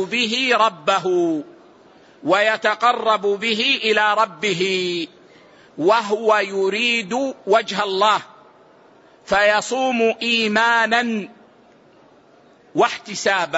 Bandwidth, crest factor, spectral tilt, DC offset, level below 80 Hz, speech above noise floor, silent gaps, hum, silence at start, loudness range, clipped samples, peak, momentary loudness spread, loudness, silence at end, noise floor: 8 kHz; 16 dB; -3 dB/octave; under 0.1%; -62 dBFS; 33 dB; none; none; 0 s; 2 LU; under 0.1%; -4 dBFS; 8 LU; -18 LUFS; 0 s; -51 dBFS